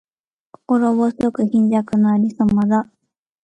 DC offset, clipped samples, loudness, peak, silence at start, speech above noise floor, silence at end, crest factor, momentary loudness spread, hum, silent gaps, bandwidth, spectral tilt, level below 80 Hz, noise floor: under 0.1%; under 0.1%; -17 LUFS; -4 dBFS; 0.7 s; 34 dB; 0.6 s; 14 dB; 4 LU; none; none; 8.8 kHz; -9 dB/octave; -52 dBFS; -50 dBFS